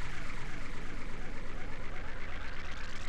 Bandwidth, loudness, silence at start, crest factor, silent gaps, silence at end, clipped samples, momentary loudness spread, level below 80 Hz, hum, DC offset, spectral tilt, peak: 8.2 kHz; -44 LUFS; 0 s; 8 dB; none; 0 s; under 0.1%; 2 LU; -40 dBFS; none; under 0.1%; -4.5 dB/octave; -22 dBFS